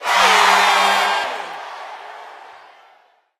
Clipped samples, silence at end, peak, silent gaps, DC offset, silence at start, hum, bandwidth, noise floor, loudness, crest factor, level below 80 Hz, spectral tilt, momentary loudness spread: under 0.1%; 0.9 s; 0 dBFS; none; under 0.1%; 0 s; none; 15.5 kHz; -55 dBFS; -14 LUFS; 18 dB; -62 dBFS; 0 dB/octave; 23 LU